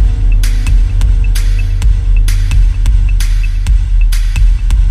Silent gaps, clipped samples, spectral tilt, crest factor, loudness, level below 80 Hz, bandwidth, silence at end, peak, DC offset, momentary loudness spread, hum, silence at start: none; under 0.1%; -5 dB/octave; 8 dB; -14 LUFS; -8 dBFS; 12 kHz; 0 s; 0 dBFS; under 0.1%; 2 LU; none; 0 s